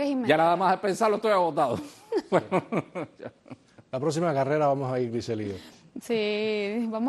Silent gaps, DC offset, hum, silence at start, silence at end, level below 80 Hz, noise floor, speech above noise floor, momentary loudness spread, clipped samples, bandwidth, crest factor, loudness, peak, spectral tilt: none; under 0.1%; none; 0 s; 0 s; -68 dBFS; -49 dBFS; 23 dB; 15 LU; under 0.1%; 12.5 kHz; 20 dB; -26 LUFS; -8 dBFS; -6 dB/octave